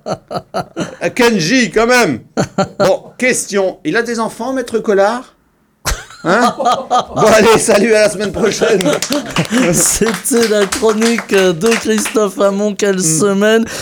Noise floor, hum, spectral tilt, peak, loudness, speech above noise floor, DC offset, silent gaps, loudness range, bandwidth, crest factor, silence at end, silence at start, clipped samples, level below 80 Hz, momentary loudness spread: -55 dBFS; none; -3.5 dB/octave; 0 dBFS; -13 LUFS; 42 dB; under 0.1%; none; 4 LU; over 20 kHz; 14 dB; 0 s; 0.05 s; under 0.1%; -40 dBFS; 10 LU